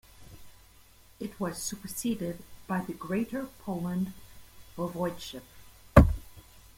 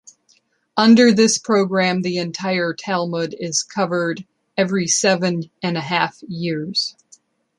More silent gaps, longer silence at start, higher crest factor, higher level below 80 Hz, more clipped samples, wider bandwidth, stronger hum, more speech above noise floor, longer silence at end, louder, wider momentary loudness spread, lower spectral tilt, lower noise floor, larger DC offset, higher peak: neither; second, 0.2 s vs 0.75 s; first, 28 dB vs 18 dB; first, -38 dBFS vs -64 dBFS; neither; first, 16.5 kHz vs 11.5 kHz; neither; second, 23 dB vs 42 dB; second, 0.4 s vs 0.7 s; second, -30 LUFS vs -19 LUFS; first, 20 LU vs 11 LU; first, -6 dB/octave vs -4 dB/octave; about the same, -57 dBFS vs -60 dBFS; neither; about the same, -2 dBFS vs -2 dBFS